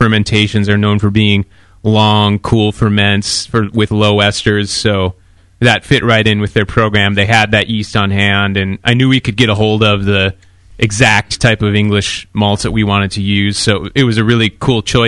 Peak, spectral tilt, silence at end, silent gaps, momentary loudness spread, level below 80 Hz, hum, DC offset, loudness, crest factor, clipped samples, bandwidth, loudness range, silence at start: 0 dBFS; -5 dB/octave; 0 s; none; 5 LU; -34 dBFS; none; under 0.1%; -12 LUFS; 12 dB; 0.1%; 11.5 kHz; 1 LU; 0 s